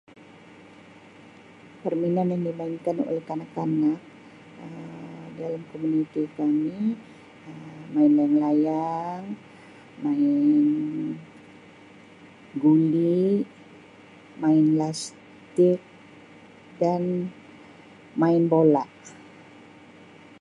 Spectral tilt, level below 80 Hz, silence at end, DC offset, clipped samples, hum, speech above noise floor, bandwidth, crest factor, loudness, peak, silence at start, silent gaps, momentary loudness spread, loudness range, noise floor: -8 dB/octave; -74 dBFS; 1.2 s; under 0.1%; under 0.1%; none; 26 dB; 11 kHz; 18 dB; -24 LUFS; -8 dBFS; 1.85 s; none; 20 LU; 6 LU; -49 dBFS